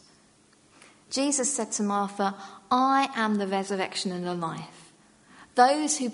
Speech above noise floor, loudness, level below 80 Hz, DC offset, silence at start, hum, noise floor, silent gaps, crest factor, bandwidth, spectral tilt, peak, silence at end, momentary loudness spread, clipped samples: 34 dB; -26 LUFS; -74 dBFS; under 0.1%; 1.1 s; none; -60 dBFS; none; 22 dB; 11 kHz; -3 dB/octave; -6 dBFS; 0 s; 11 LU; under 0.1%